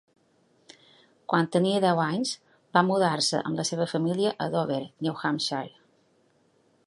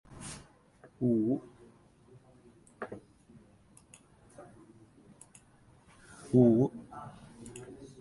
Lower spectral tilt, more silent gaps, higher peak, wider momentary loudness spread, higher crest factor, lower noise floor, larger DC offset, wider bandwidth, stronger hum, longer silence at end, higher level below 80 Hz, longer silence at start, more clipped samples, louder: second, -4.5 dB/octave vs -8 dB/octave; neither; first, -6 dBFS vs -10 dBFS; second, 9 LU vs 30 LU; about the same, 22 dB vs 24 dB; first, -66 dBFS vs -62 dBFS; neither; about the same, 11.5 kHz vs 11.5 kHz; neither; first, 1.2 s vs 0.15 s; second, -74 dBFS vs -66 dBFS; first, 1.3 s vs 0.2 s; neither; first, -26 LUFS vs -30 LUFS